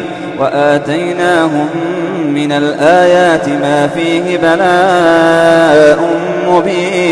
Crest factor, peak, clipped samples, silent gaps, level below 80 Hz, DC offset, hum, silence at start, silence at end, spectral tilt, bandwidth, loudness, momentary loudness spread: 10 dB; 0 dBFS; 0.2%; none; -48 dBFS; under 0.1%; none; 0 s; 0 s; -5.5 dB/octave; 11 kHz; -10 LUFS; 8 LU